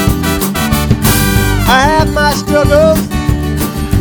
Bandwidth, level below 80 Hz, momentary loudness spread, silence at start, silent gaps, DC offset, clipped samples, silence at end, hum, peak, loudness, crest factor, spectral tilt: over 20 kHz; -20 dBFS; 6 LU; 0 s; none; under 0.1%; 0.3%; 0 s; none; 0 dBFS; -11 LUFS; 10 dB; -5 dB/octave